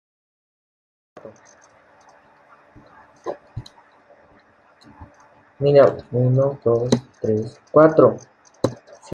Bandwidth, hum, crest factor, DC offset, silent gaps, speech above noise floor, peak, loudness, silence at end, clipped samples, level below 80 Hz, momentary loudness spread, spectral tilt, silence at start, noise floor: 10.5 kHz; none; 20 dB; under 0.1%; none; 37 dB; -2 dBFS; -18 LUFS; 0.4 s; under 0.1%; -58 dBFS; 21 LU; -7.5 dB/octave; 1.25 s; -54 dBFS